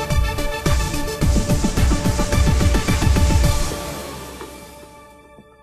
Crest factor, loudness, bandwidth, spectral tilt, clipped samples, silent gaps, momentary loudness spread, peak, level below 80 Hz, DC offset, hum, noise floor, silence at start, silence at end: 14 dB; -20 LUFS; 14 kHz; -5 dB/octave; under 0.1%; none; 16 LU; -4 dBFS; -22 dBFS; under 0.1%; none; -46 dBFS; 0 s; 0.2 s